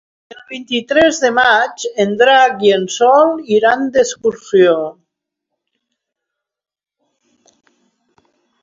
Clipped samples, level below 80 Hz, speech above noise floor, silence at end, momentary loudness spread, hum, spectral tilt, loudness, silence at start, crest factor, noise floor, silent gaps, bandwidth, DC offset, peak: under 0.1%; -58 dBFS; 67 dB; 3.7 s; 10 LU; none; -3.5 dB/octave; -13 LUFS; 0.5 s; 16 dB; -80 dBFS; none; 7.8 kHz; under 0.1%; 0 dBFS